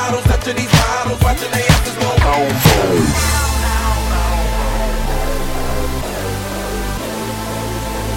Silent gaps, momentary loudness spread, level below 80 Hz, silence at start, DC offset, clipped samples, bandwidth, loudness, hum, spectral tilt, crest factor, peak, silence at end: none; 9 LU; -20 dBFS; 0 s; under 0.1%; under 0.1%; 17 kHz; -16 LUFS; none; -4.5 dB/octave; 16 dB; 0 dBFS; 0 s